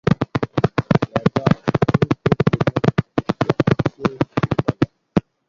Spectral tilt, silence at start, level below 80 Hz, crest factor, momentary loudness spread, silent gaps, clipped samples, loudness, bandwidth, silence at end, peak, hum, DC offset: -8 dB/octave; 0.05 s; -42 dBFS; 18 dB; 4 LU; none; under 0.1%; -20 LUFS; 7.2 kHz; 0.3 s; 0 dBFS; none; under 0.1%